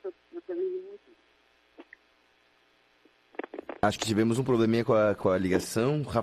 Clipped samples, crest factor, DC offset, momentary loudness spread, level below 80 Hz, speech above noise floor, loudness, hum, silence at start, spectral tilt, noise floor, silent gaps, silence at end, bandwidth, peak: under 0.1%; 18 dB; under 0.1%; 17 LU; -60 dBFS; 40 dB; -27 LUFS; 60 Hz at -65 dBFS; 0.05 s; -6 dB/octave; -66 dBFS; none; 0 s; 14 kHz; -10 dBFS